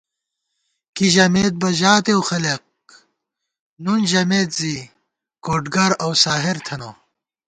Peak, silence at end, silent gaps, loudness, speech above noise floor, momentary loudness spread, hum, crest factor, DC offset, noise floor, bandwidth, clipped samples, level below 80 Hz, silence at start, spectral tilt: 0 dBFS; 0.55 s; 3.60-3.76 s; -17 LUFS; 61 dB; 16 LU; none; 20 dB; under 0.1%; -79 dBFS; 9.4 kHz; under 0.1%; -54 dBFS; 0.95 s; -4 dB/octave